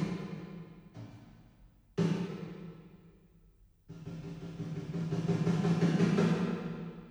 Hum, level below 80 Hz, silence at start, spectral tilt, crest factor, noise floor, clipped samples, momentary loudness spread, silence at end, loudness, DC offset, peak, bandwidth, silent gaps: none; -62 dBFS; 0 s; -7.5 dB/octave; 18 dB; -63 dBFS; under 0.1%; 22 LU; 0 s; -34 LUFS; under 0.1%; -16 dBFS; 9.6 kHz; none